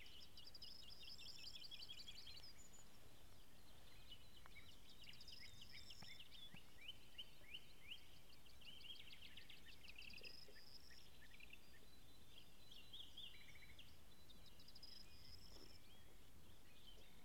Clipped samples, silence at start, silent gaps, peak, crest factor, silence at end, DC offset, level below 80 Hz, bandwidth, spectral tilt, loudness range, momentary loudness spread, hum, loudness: under 0.1%; 0 s; none; -42 dBFS; 18 dB; 0 s; 0.2%; -72 dBFS; 16 kHz; -2 dB/octave; 5 LU; 11 LU; none; -61 LUFS